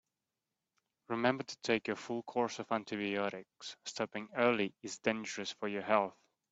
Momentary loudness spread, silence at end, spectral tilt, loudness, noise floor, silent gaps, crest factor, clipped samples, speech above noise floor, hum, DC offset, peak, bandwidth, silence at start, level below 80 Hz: 9 LU; 0.4 s; -4 dB/octave; -36 LUFS; -90 dBFS; none; 22 dB; under 0.1%; 54 dB; none; under 0.1%; -14 dBFS; 8.2 kHz; 1.1 s; -78 dBFS